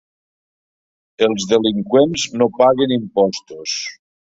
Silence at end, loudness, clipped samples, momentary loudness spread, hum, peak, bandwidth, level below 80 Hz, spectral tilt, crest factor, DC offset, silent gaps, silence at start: 0.4 s; -17 LUFS; under 0.1%; 10 LU; none; -2 dBFS; 8 kHz; -56 dBFS; -4.5 dB/octave; 16 dB; under 0.1%; none; 1.2 s